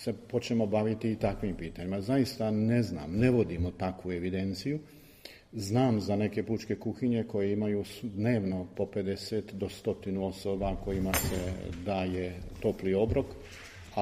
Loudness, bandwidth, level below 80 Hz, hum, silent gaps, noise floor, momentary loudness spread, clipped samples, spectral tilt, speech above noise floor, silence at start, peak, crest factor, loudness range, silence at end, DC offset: -32 LUFS; 15.5 kHz; -48 dBFS; none; none; -52 dBFS; 10 LU; under 0.1%; -6.5 dB/octave; 21 dB; 0 s; -10 dBFS; 20 dB; 3 LU; 0 s; under 0.1%